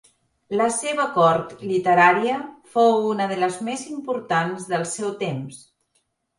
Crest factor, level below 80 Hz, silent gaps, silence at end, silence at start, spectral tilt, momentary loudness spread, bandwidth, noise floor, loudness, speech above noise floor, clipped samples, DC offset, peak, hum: 20 dB; -68 dBFS; none; 0.8 s; 0.5 s; -4.5 dB/octave; 13 LU; 11.5 kHz; -70 dBFS; -21 LUFS; 49 dB; under 0.1%; under 0.1%; -2 dBFS; none